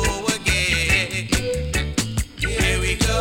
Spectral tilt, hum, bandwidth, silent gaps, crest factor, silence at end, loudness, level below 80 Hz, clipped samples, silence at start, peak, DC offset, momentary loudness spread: -3.5 dB/octave; none; 17.5 kHz; none; 16 dB; 0 s; -21 LUFS; -28 dBFS; under 0.1%; 0 s; -6 dBFS; under 0.1%; 6 LU